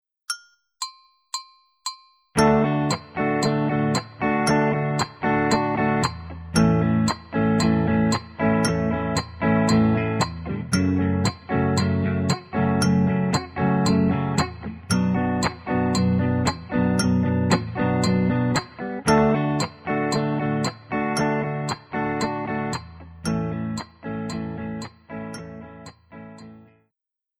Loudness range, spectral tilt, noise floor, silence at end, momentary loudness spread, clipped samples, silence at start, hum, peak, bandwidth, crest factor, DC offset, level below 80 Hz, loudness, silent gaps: 7 LU; -6 dB/octave; -86 dBFS; 0.8 s; 14 LU; under 0.1%; 0.3 s; none; -4 dBFS; 15.5 kHz; 20 dB; under 0.1%; -46 dBFS; -23 LUFS; none